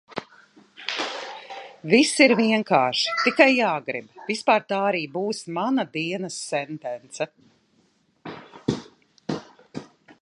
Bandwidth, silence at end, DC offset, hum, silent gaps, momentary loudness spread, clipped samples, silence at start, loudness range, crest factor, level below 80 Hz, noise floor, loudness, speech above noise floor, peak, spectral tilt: 11.5 kHz; 0.1 s; under 0.1%; none; none; 21 LU; under 0.1%; 0.1 s; 13 LU; 24 dB; -68 dBFS; -65 dBFS; -23 LUFS; 42 dB; -2 dBFS; -4 dB/octave